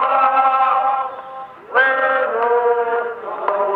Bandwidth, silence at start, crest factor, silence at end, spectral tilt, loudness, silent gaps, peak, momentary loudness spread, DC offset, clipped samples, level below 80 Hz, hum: 5 kHz; 0 s; 16 dB; 0 s; -5 dB/octave; -17 LUFS; none; -2 dBFS; 12 LU; under 0.1%; under 0.1%; -72 dBFS; none